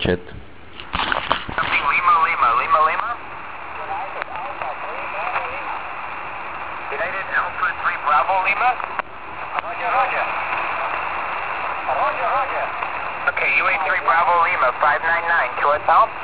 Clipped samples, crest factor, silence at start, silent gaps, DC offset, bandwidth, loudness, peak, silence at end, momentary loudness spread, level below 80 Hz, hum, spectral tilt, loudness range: under 0.1%; 20 dB; 0 s; none; 1%; 4 kHz; -20 LUFS; 0 dBFS; 0 s; 13 LU; -48 dBFS; none; -7 dB/octave; 8 LU